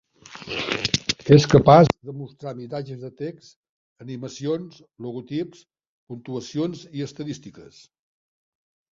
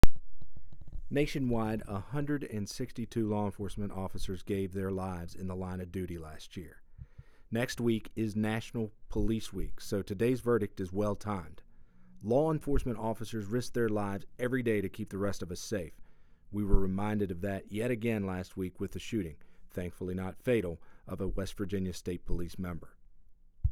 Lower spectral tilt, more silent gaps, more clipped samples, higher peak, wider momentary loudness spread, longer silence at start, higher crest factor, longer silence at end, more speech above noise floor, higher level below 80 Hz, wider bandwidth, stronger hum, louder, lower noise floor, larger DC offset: about the same, -6 dB/octave vs -6.5 dB/octave; first, 3.56-3.63 s, 3.69-3.96 s, 5.87-6.07 s vs none; neither; first, -2 dBFS vs -6 dBFS; first, 23 LU vs 10 LU; first, 0.35 s vs 0.05 s; about the same, 22 dB vs 24 dB; first, 1.3 s vs 0 s; about the same, 17 dB vs 20 dB; second, -52 dBFS vs -42 dBFS; second, 7.6 kHz vs 15 kHz; neither; first, -21 LUFS vs -35 LUFS; second, -39 dBFS vs -53 dBFS; neither